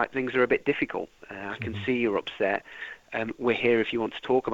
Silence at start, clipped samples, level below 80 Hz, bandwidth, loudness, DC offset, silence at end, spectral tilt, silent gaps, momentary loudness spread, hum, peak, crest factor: 0 s; under 0.1%; -60 dBFS; 7.8 kHz; -27 LUFS; under 0.1%; 0 s; -6.5 dB/octave; none; 13 LU; none; -10 dBFS; 18 dB